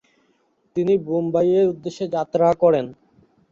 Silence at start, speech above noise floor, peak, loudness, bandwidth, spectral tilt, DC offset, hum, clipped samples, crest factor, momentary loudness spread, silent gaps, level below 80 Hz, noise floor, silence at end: 0.75 s; 45 dB; -4 dBFS; -20 LUFS; 7.4 kHz; -8 dB/octave; under 0.1%; none; under 0.1%; 16 dB; 10 LU; none; -60 dBFS; -64 dBFS; 0.6 s